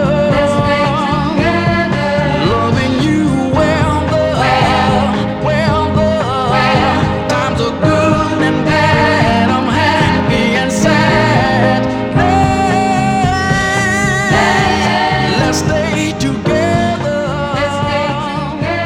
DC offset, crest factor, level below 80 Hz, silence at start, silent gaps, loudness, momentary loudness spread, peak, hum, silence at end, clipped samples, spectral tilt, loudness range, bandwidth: under 0.1%; 12 dB; -30 dBFS; 0 s; none; -13 LUFS; 5 LU; 0 dBFS; none; 0 s; under 0.1%; -5.5 dB/octave; 2 LU; 15.5 kHz